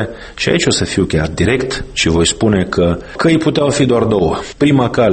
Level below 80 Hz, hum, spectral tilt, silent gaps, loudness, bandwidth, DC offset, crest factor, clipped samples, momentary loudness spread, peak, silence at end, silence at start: -32 dBFS; none; -5 dB/octave; none; -14 LUFS; 8.8 kHz; under 0.1%; 12 dB; under 0.1%; 4 LU; 0 dBFS; 0 s; 0 s